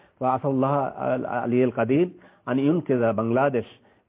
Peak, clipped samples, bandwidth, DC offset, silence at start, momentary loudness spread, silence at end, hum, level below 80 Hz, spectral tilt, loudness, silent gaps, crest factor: -10 dBFS; under 0.1%; 3.8 kHz; under 0.1%; 0.2 s; 6 LU; 0.4 s; none; -62 dBFS; -12 dB/octave; -24 LUFS; none; 14 dB